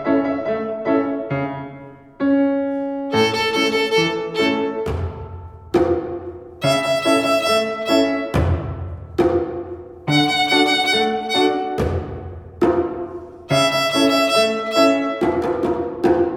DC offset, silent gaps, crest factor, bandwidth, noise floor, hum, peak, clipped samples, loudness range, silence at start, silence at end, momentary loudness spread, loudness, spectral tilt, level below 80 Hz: under 0.1%; none; 16 dB; 19.5 kHz; -39 dBFS; none; -2 dBFS; under 0.1%; 3 LU; 0 s; 0 s; 14 LU; -19 LUFS; -5 dB/octave; -40 dBFS